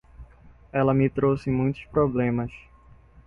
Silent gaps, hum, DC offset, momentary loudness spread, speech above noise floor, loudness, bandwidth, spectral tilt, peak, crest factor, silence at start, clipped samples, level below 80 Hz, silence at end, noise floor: none; none; under 0.1%; 8 LU; 29 dB; -24 LUFS; 6.6 kHz; -10 dB/octave; -8 dBFS; 18 dB; 0.2 s; under 0.1%; -48 dBFS; 0.7 s; -52 dBFS